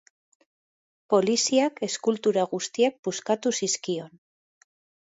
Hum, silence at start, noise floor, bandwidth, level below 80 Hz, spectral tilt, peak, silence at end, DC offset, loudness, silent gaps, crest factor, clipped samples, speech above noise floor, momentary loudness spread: none; 1.1 s; under -90 dBFS; 8 kHz; -76 dBFS; -3 dB/octave; -8 dBFS; 1 s; under 0.1%; -25 LUFS; 2.99-3.03 s; 18 dB; under 0.1%; over 65 dB; 7 LU